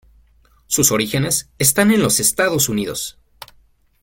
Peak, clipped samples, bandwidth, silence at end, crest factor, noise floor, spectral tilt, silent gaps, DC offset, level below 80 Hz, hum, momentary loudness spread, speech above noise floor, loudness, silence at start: 0 dBFS; under 0.1%; 17 kHz; 0.9 s; 20 dB; -54 dBFS; -3 dB/octave; none; under 0.1%; -48 dBFS; none; 9 LU; 37 dB; -16 LUFS; 0.7 s